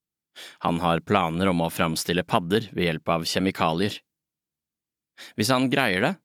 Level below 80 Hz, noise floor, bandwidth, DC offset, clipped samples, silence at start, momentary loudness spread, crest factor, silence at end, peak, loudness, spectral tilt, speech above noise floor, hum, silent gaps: -56 dBFS; -89 dBFS; 17.5 kHz; under 0.1%; under 0.1%; 0.35 s; 8 LU; 22 dB; 0.1 s; -4 dBFS; -24 LUFS; -5 dB/octave; 66 dB; none; none